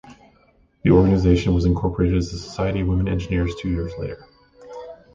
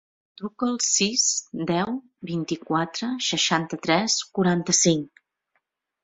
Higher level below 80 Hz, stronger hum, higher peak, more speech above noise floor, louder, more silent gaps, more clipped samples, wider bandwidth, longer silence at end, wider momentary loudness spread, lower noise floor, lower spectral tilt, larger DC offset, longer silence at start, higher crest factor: first, -32 dBFS vs -64 dBFS; neither; about the same, -4 dBFS vs -4 dBFS; second, 38 dB vs 51 dB; about the same, -21 LUFS vs -23 LUFS; neither; neither; about the same, 7.6 kHz vs 8.2 kHz; second, 0.2 s vs 0.95 s; first, 21 LU vs 12 LU; second, -58 dBFS vs -75 dBFS; first, -8 dB/octave vs -3 dB/octave; neither; second, 0.05 s vs 0.4 s; about the same, 18 dB vs 22 dB